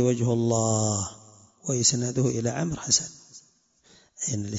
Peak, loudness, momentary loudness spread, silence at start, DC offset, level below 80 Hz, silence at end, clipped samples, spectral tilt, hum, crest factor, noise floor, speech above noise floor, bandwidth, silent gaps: -8 dBFS; -25 LUFS; 10 LU; 0 s; under 0.1%; -58 dBFS; 0 s; under 0.1%; -4 dB/octave; none; 20 dB; -62 dBFS; 37 dB; 8 kHz; none